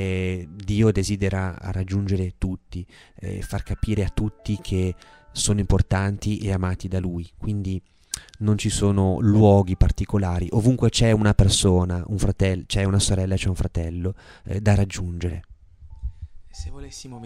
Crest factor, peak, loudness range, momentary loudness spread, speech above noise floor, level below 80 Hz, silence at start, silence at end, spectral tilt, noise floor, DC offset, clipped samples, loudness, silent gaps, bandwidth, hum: 18 dB; -4 dBFS; 8 LU; 19 LU; 22 dB; -32 dBFS; 0 s; 0 s; -6 dB/octave; -44 dBFS; under 0.1%; under 0.1%; -23 LUFS; none; 13 kHz; none